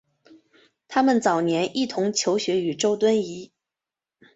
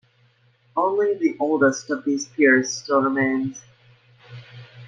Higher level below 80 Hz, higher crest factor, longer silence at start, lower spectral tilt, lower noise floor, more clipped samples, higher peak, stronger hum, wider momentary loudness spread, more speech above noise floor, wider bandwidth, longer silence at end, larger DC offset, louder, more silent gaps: about the same, -68 dBFS vs -68 dBFS; about the same, 18 dB vs 18 dB; first, 0.9 s vs 0.75 s; about the same, -4 dB/octave vs -4.5 dB/octave; first, -89 dBFS vs -60 dBFS; neither; about the same, -6 dBFS vs -4 dBFS; neither; second, 6 LU vs 14 LU; first, 67 dB vs 39 dB; second, 8.2 kHz vs 9.2 kHz; first, 0.9 s vs 0 s; neither; about the same, -23 LUFS vs -21 LUFS; neither